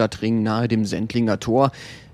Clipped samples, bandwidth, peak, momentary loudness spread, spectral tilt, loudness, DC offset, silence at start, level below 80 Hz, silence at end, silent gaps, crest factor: under 0.1%; 12 kHz; -4 dBFS; 3 LU; -6.5 dB/octave; -21 LUFS; under 0.1%; 0 s; -50 dBFS; 0.1 s; none; 18 dB